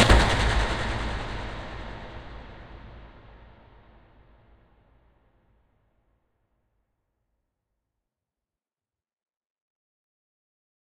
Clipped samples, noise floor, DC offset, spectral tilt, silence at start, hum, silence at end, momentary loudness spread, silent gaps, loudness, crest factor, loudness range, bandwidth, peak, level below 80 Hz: under 0.1%; under -90 dBFS; under 0.1%; -4.5 dB/octave; 0 s; none; 7.6 s; 25 LU; none; -26 LUFS; 30 dB; 25 LU; 11.5 kHz; -2 dBFS; -34 dBFS